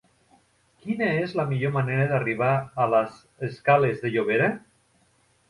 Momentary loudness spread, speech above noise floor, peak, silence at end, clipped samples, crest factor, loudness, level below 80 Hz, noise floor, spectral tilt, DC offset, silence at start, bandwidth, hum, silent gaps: 13 LU; 40 dB; -6 dBFS; 0.9 s; under 0.1%; 18 dB; -24 LUFS; -62 dBFS; -64 dBFS; -8 dB/octave; under 0.1%; 0.85 s; 11 kHz; none; none